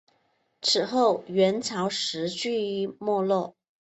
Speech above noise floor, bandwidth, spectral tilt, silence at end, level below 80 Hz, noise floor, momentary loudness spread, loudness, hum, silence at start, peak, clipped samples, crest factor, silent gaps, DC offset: 44 dB; 8.4 kHz; -4 dB/octave; 0.45 s; -72 dBFS; -70 dBFS; 6 LU; -26 LUFS; none; 0.6 s; -10 dBFS; under 0.1%; 16 dB; none; under 0.1%